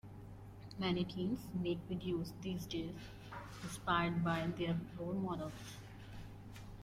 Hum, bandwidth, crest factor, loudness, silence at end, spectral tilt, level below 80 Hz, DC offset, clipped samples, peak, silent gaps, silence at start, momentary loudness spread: 50 Hz at -55 dBFS; 15.5 kHz; 18 dB; -40 LUFS; 0 s; -6 dB/octave; -60 dBFS; under 0.1%; under 0.1%; -22 dBFS; none; 0.05 s; 17 LU